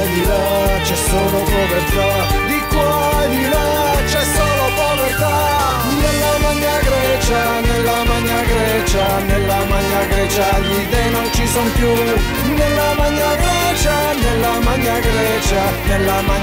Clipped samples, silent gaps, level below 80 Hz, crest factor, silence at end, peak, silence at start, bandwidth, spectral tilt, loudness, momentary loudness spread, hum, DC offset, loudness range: under 0.1%; none; -22 dBFS; 10 dB; 0 s; -6 dBFS; 0 s; 16.5 kHz; -4.5 dB/octave; -15 LUFS; 1 LU; none; 0.1%; 1 LU